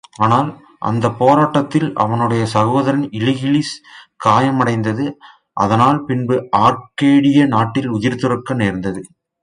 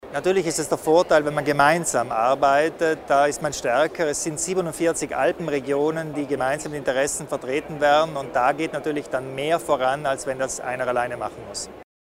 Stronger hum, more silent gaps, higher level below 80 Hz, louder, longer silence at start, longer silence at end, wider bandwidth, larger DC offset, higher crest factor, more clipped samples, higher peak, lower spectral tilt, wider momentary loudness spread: neither; neither; about the same, -50 dBFS vs -54 dBFS; first, -16 LUFS vs -22 LUFS; first, 0.2 s vs 0.05 s; first, 0.35 s vs 0.15 s; second, 10.5 kHz vs 16 kHz; neither; about the same, 16 dB vs 20 dB; neither; about the same, 0 dBFS vs -2 dBFS; first, -7 dB/octave vs -4 dB/octave; about the same, 10 LU vs 9 LU